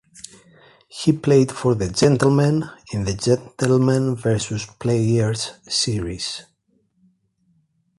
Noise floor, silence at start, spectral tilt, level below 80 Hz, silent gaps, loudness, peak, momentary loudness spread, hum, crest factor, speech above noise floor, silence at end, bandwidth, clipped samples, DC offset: -65 dBFS; 0.95 s; -5.5 dB/octave; -46 dBFS; none; -20 LUFS; -2 dBFS; 12 LU; none; 18 dB; 46 dB; 1.6 s; 11.5 kHz; under 0.1%; under 0.1%